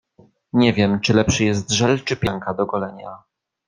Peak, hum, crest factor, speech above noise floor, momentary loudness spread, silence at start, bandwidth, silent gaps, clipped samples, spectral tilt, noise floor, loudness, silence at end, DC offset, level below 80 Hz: -2 dBFS; none; 18 dB; 36 dB; 10 LU; 0.55 s; 10 kHz; none; under 0.1%; -5 dB/octave; -55 dBFS; -19 LUFS; 0.5 s; under 0.1%; -46 dBFS